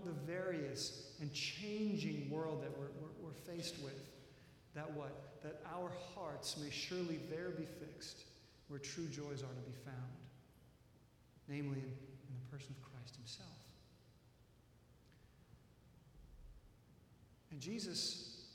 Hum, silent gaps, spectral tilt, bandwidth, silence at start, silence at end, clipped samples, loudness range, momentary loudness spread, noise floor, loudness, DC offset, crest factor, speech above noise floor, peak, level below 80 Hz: none; none; -4.5 dB/octave; 17 kHz; 0 s; 0 s; under 0.1%; 16 LU; 24 LU; -68 dBFS; -47 LUFS; under 0.1%; 18 dB; 22 dB; -30 dBFS; -72 dBFS